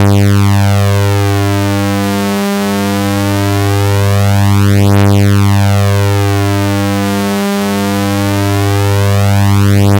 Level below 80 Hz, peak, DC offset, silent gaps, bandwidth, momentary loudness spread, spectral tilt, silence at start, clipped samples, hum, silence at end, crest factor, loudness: -42 dBFS; 0 dBFS; under 0.1%; none; 17 kHz; 4 LU; -6 dB/octave; 0 s; under 0.1%; none; 0 s; 10 dB; -11 LUFS